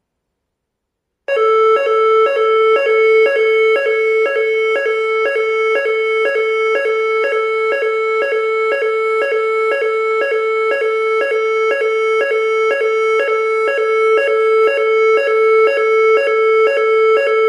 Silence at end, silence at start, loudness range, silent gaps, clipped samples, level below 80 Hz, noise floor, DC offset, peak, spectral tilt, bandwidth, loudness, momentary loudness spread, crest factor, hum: 0 s; 1.3 s; 3 LU; none; under 0.1%; -68 dBFS; -76 dBFS; under 0.1%; -4 dBFS; -1 dB/octave; 10.5 kHz; -14 LUFS; 4 LU; 10 dB; none